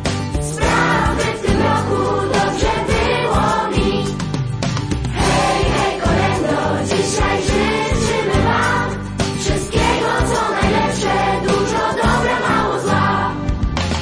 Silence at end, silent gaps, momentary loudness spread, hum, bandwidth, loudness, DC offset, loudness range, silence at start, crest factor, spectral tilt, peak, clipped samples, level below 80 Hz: 0 s; none; 5 LU; none; 10.5 kHz; -17 LUFS; under 0.1%; 1 LU; 0 s; 14 dB; -5 dB/octave; -4 dBFS; under 0.1%; -28 dBFS